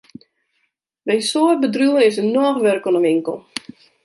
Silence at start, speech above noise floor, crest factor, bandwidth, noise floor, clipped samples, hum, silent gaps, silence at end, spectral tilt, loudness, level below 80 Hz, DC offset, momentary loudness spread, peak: 1.05 s; 54 dB; 16 dB; 11.5 kHz; -70 dBFS; under 0.1%; none; none; 0.65 s; -4.5 dB/octave; -17 LUFS; -72 dBFS; under 0.1%; 14 LU; -2 dBFS